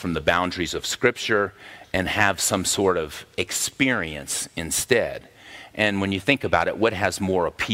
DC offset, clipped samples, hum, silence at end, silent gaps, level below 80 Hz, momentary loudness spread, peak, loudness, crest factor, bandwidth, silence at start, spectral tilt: under 0.1%; under 0.1%; none; 0 s; none; -48 dBFS; 9 LU; -2 dBFS; -23 LUFS; 22 dB; 16 kHz; 0 s; -3 dB/octave